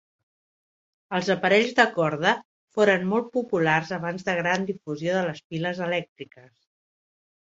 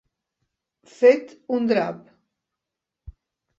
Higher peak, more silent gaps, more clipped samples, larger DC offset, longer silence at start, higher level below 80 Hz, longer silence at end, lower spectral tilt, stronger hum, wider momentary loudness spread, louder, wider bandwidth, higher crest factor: about the same, -2 dBFS vs -4 dBFS; first, 2.45-2.68 s, 5.44-5.50 s, 6.09-6.16 s vs none; neither; neither; about the same, 1.1 s vs 1 s; second, -68 dBFS vs -56 dBFS; second, 1.25 s vs 1.6 s; about the same, -5.5 dB/octave vs -6.5 dB/octave; neither; about the same, 10 LU vs 12 LU; second, -24 LUFS vs -21 LUFS; about the same, 7.8 kHz vs 7.6 kHz; about the same, 22 dB vs 22 dB